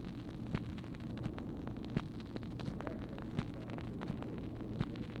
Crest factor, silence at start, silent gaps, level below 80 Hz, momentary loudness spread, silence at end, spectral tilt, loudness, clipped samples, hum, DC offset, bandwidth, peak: 20 dB; 0 s; none; -54 dBFS; 4 LU; 0 s; -8 dB/octave; -43 LUFS; under 0.1%; none; under 0.1%; 11.5 kHz; -22 dBFS